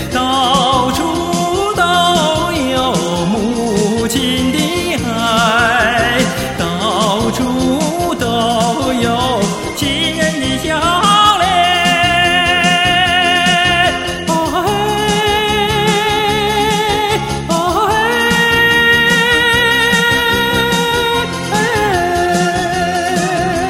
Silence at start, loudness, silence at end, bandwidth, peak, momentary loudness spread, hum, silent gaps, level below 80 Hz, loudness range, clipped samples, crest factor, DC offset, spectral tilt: 0 s; -12 LUFS; 0 s; 16.5 kHz; 0 dBFS; 6 LU; none; none; -34 dBFS; 4 LU; under 0.1%; 14 dB; under 0.1%; -3.5 dB/octave